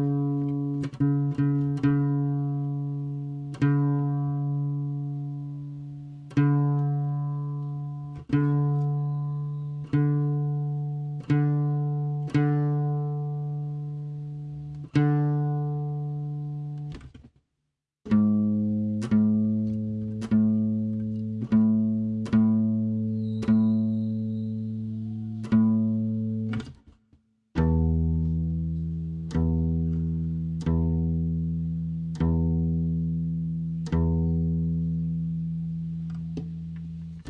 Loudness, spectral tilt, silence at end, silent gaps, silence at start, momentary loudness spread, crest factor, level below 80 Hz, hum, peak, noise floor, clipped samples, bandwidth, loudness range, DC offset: -27 LUFS; -10 dB/octave; 0 s; none; 0 s; 11 LU; 16 dB; -44 dBFS; none; -10 dBFS; -81 dBFS; under 0.1%; 6 kHz; 4 LU; under 0.1%